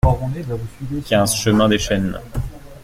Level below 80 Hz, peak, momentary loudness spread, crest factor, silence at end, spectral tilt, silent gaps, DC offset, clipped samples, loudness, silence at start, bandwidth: -30 dBFS; -2 dBFS; 13 LU; 16 dB; 0 s; -5 dB/octave; none; under 0.1%; under 0.1%; -19 LUFS; 0.05 s; 16.5 kHz